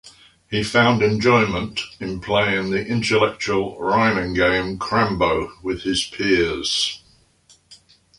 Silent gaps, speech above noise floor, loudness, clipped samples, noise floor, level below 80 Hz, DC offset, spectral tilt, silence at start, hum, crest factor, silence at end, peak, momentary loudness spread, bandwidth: none; 36 dB; -20 LUFS; under 0.1%; -56 dBFS; -44 dBFS; under 0.1%; -4.5 dB/octave; 0.05 s; none; 18 dB; 0.45 s; -2 dBFS; 10 LU; 11.5 kHz